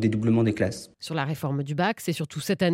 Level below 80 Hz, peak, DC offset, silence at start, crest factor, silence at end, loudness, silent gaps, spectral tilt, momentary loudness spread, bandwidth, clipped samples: -60 dBFS; -8 dBFS; under 0.1%; 0 s; 16 dB; 0 s; -26 LUFS; none; -6 dB/octave; 7 LU; 16.5 kHz; under 0.1%